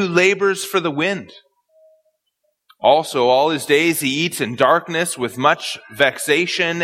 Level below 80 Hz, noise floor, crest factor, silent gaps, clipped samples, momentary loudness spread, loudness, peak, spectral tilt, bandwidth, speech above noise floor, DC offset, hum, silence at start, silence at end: -66 dBFS; -71 dBFS; 18 dB; none; under 0.1%; 6 LU; -17 LUFS; 0 dBFS; -3.5 dB/octave; 16.5 kHz; 53 dB; under 0.1%; none; 0 s; 0 s